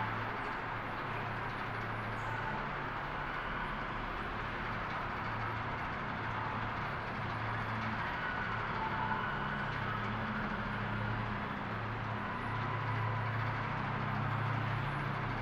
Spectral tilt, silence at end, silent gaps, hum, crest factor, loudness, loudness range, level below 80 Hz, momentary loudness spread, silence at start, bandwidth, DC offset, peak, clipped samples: -7 dB/octave; 0 s; none; none; 14 dB; -37 LUFS; 2 LU; -52 dBFS; 3 LU; 0 s; 7.8 kHz; under 0.1%; -22 dBFS; under 0.1%